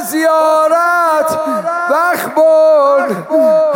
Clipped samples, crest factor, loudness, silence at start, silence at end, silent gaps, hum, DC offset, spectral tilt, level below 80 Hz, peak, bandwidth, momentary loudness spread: under 0.1%; 8 dB; -11 LUFS; 0 s; 0 s; none; none; under 0.1%; -4 dB/octave; -64 dBFS; -2 dBFS; 17 kHz; 6 LU